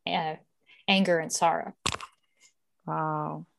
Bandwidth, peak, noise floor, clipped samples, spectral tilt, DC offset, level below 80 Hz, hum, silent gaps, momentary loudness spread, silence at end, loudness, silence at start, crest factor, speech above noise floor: 12.5 kHz; -6 dBFS; -65 dBFS; under 0.1%; -3.5 dB/octave; under 0.1%; -62 dBFS; none; none; 17 LU; 0.15 s; -28 LUFS; 0.05 s; 24 dB; 38 dB